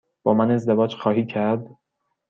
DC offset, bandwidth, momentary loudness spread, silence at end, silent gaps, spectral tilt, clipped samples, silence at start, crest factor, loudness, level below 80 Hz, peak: under 0.1%; 7.2 kHz; 5 LU; 0.6 s; none; -8.5 dB/octave; under 0.1%; 0.25 s; 18 dB; -21 LUFS; -64 dBFS; -4 dBFS